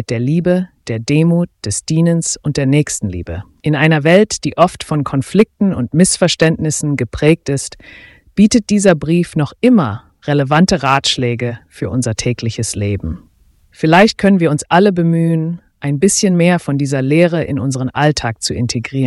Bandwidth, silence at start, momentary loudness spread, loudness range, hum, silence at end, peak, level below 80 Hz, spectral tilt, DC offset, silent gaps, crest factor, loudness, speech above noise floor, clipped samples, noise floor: 12 kHz; 0 s; 10 LU; 3 LU; none; 0 s; 0 dBFS; -40 dBFS; -5.5 dB/octave; under 0.1%; none; 14 dB; -14 LUFS; 37 dB; under 0.1%; -51 dBFS